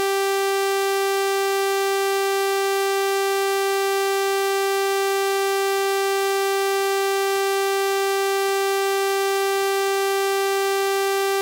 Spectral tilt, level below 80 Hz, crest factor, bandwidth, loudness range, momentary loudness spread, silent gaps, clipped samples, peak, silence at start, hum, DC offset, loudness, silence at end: 0.5 dB/octave; -76 dBFS; 8 dB; 17 kHz; 0 LU; 0 LU; none; under 0.1%; -14 dBFS; 0 s; none; under 0.1%; -21 LUFS; 0 s